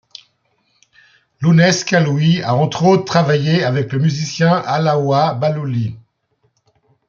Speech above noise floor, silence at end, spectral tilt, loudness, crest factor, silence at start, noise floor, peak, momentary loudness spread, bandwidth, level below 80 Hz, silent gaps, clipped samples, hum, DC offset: 50 dB; 1.1 s; -6 dB/octave; -15 LUFS; 14 dB; 1.4 s; -64 dBFS; -2 dBFS; 7 LU; 7.4 kHz; -56 dBFS; none; under 0.1%; none; under 0.1%